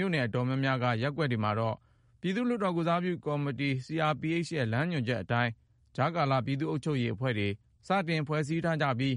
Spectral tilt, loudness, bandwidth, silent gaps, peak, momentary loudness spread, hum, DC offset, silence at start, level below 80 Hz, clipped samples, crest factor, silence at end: -7 dB/octave; -31 LUFS; 11 kHz; none; -14 dBFS; 4 LU; none; under 0.1%; 0 s; -64 dBFS; under 0.1%; 16 dB; 0 s